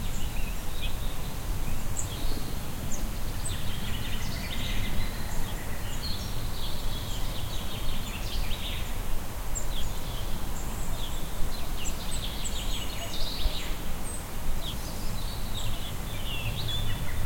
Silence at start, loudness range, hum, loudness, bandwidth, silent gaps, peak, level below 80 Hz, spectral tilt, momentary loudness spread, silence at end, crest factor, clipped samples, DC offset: 0 s; 1 LU; none; -35 LUFS; 17 kHz; none; -12 dBFS; -32 dBFS; -3.5 dB/octave; 4 LU; 0 s; 14 dB; under 0.1%; under 0.1%